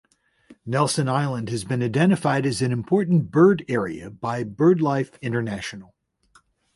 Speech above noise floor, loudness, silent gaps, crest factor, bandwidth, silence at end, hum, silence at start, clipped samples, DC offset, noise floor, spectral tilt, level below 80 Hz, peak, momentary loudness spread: 38 dB; -22 LUFS; none; 18 dB; 11.5 kHz; 0.95 s; none; 0.5 s; under 0.1%; under 0.1%; -60 dBFS; -6.5 dB/octave; -58 dBFS; -6 dBFS; 13 LU